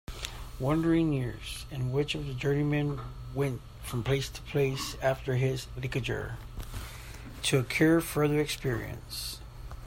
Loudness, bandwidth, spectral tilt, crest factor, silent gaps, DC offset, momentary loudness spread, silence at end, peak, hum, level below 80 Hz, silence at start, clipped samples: -31 LUFS; 16 kHz; -5.5 dB/octave; 20 dB; none; under 0.1%; 15 LU; 0 s; -10 dBFS; none; -46 dBFS; 0.1 s; under 0.1%